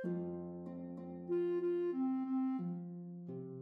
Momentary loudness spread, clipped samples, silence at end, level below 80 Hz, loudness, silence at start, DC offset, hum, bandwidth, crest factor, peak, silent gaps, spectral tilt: 11 LU; under 0.1%; 0 s; -82 dBFS; -40 LUFS; 0 s; under 0.1%; none; 4.1 kHz; 10 dB; -28 dBFS; none; -11 dB/octave